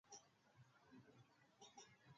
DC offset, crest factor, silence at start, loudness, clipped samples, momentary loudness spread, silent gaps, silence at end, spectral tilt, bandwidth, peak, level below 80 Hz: under 0.1%; 20 dB; 0.05 s; -66 LUFS; under 0.1%; 5 LU; none; 0 s; -3.5 dB/octave; 7.4 kHz; -48 dBFS; under -90 dBFS